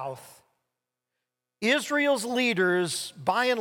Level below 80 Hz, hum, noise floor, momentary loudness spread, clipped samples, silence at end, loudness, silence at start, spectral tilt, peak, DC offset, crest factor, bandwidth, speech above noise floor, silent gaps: -76 dBFS; none; -85 dBFS; 6 LU; under 0.1%; 0 s; -25 LUFS; 0 s; -3.5 dB/octave; -12 dBFS; under 0.1%; 16 dB; 18 kHz; 59 dB; none